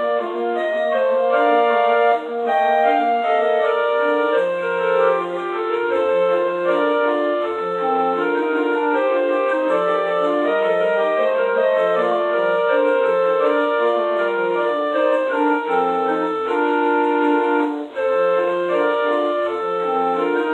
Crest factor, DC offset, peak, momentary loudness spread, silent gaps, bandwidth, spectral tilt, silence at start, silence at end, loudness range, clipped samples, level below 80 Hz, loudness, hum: 14 dB; under 0.1%; -4 dBFS; 4 LU; none; 8.4 kHz; -6 dB/octave; 0 s; 0 s; 2 LU; under 0.1%; -82 dBFS; -18 LUFS; none